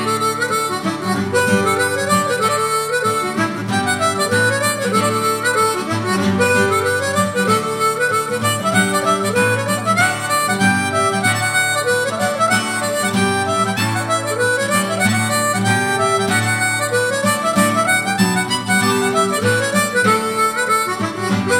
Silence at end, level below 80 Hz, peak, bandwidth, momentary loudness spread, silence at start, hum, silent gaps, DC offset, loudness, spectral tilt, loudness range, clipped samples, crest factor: 0 s; -58 dBFS; 0 dBFS; 17.5 kHz; 3 LU; 0 s; none; none; under 0.1%; -16 LUFS; -3.5 dB/octave; 1 LU; under 0.1%; 16 dB